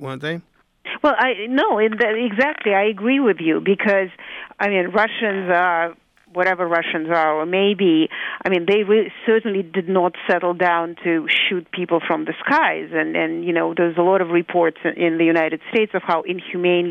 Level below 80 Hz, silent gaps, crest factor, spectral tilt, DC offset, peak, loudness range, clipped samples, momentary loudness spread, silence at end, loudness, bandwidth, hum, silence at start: -64 dBFS; none; 14 dB; -7 dB/octave; under 0.1%; -6 dBFS; 1 LU; under 0.1%; 6 LU; 0 s; -19 LUFS; 6.4 kHz; none; 0 s